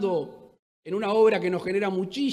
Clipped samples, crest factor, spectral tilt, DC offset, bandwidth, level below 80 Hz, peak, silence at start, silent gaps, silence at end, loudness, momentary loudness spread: under 0.1%; 16 dB; -6.5 dB/octave; under 0.1%; 11.5 kHz; -70 dBFS; -10 dBFS; 0 s; 0.59-0.83 s; 0 s; -25 LUFS; 11 LU